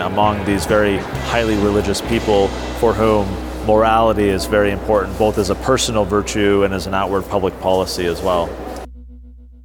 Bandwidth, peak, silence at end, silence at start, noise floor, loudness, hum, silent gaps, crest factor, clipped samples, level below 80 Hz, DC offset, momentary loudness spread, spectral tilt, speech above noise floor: 18.5 kHz; -2 dBFS; 0.05 s; 0 s; -39 dBFS; -17 LUFS; none; none; 16 dB; under 0.1%; -30 dBFS; under 0.1%; 6 LU; -5 dB/octave; 22 dB